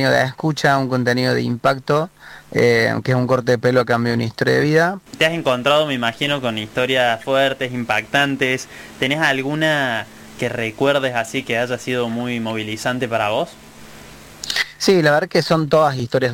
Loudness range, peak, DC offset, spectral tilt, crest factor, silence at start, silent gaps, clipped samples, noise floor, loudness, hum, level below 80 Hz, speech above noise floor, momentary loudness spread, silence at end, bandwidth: 4 LU; -4 dBFS; under 0.1%; -5 dB/octave; 16 dB; 0 s; none; under 0.1%; -40 dBFS; -18 LUFS; none; -54 dBFS; 21 dB; 8 LU; 0 s; 17 kHz